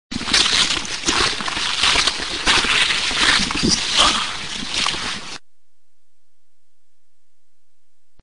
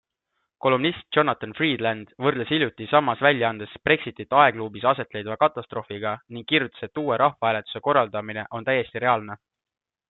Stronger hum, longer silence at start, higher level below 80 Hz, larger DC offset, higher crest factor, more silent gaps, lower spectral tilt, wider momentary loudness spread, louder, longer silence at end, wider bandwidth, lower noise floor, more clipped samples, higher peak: neither; second, 0.1 s vs 0.65 s; first, -40 dBFS vs -64 dBFS; first, 2% vs under 0.1%; about the same, 18 dB vs 22 dB; neither; second, -1 dB/octave vs -9.5 dB/octave; about the same, 10 LU vs 10 LU; first, -16 LUFS vs -23 LUFS; second, 0 s vs 0.75 s; first, 10.5 kHz vs 4.3 kHz; second, -73 dBFS vs -78 dBFS; neither; about the same, -2 dBFS vs -2 dBFS